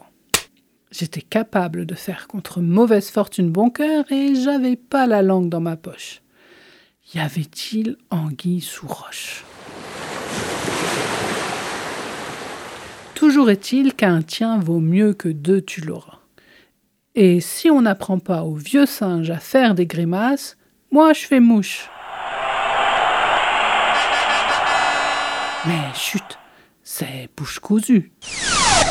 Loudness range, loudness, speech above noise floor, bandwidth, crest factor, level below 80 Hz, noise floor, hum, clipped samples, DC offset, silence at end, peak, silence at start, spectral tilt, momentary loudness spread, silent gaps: 8 LU; -19 LUFS; 47 dB; 17 kHz; 18 dB; -48 dBFS; -65 dBFS; none; under 0.1%; under 0.1%; 0 s; 0 dBFS; 0.35 s; -4.5 dB/octave; 16 LU; none